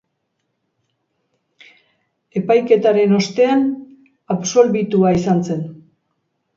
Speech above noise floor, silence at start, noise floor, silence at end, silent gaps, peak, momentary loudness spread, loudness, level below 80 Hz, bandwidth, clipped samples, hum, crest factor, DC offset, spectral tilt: 57 dB; 2.35 s; -72 dBFS; 0.8 s; none; 0 dBFS; 12 LU; -16 LUFS; -54 dBFS; 7.6 kHz; under 0.1%; none; 18 dB; under 0.1%; -6 dB/octave